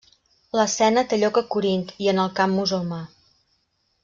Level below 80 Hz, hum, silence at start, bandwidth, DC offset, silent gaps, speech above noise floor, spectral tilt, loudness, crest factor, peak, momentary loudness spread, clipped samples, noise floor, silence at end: -62 dBFS; none; 0.55 s; 7.6 kHz; under 0.1%; none; 48 dB; -4.5 dB/octave; -22 LUFS; 16 dB; -6 dBFS; 9 LU; under 0.1%; -69 dBFS; 0.95 s